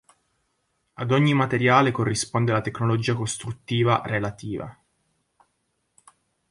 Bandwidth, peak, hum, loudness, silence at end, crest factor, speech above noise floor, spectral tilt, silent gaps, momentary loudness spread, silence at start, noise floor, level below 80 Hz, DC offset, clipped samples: 11.5 kHz; -4 dBFS; none; -23 LUFS; 1.8 s; 22 dB; 51 dB; -5.5 dB/octave; none; 14 LU; 1 s; -74 dBFS; -56 dBFS; under 0.1%; under 0.1%